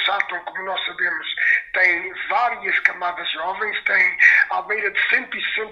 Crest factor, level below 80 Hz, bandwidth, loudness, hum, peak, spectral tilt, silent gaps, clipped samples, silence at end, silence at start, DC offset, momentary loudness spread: 20 dB; -62 dBFS; 7.2 kHz; -19 LUFS; none; 0 dBFS; -1.5 dB/octave; none; under 0.1%; 0 s; 0 s; under 0.1%; 11 LU